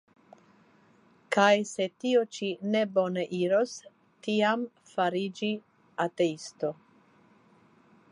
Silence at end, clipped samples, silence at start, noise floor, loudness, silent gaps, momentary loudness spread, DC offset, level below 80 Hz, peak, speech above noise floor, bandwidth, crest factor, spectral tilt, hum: 1.4 s; under 0.1%; 1.3 s; -62 dBFS; -29 LUFS; none; 11 LU; under 0.1%; -84 dBFS; -8 dBFS; 34 dB; 11 kHz; 22 dB; -5 dB/octave; none